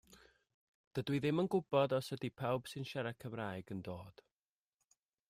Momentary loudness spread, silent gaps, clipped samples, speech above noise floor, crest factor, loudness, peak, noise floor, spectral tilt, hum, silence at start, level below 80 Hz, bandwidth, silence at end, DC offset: 12 LU; 0.54-0.91 s; under 0.1%; over 52 dB; 22 dB; -39 LUFS; -18 dBFS; under -90 dBFS; -6.5 dB/octave; none; 0.1 s; -74 dBFS; 15.5 kHz; 1.2 s; under 0.1%